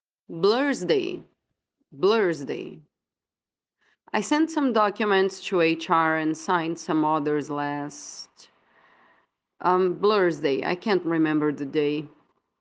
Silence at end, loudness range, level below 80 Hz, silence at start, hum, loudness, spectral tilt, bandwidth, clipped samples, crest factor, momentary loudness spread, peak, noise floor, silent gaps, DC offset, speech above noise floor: 0.55 s; 5 LU; -74 dBFS; 0.3 s; none; -24 LUFS; -5 dB/octave; 9.4 kHz; under 0.1%; 20 dB; 12 LU; -6 dBFS; under -90 dBFS; none; under 0.1%; over 66 dB